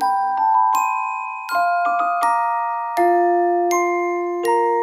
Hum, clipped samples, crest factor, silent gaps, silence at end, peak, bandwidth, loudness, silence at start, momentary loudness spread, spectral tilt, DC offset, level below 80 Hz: none; under 0.1%; 12 dB; none; 0 s; -6 dBFS; 16 kHz; -19 LUFS; 0 s; 6 LU; -2.5 dB/octave; under 0.1%; -72 dBFS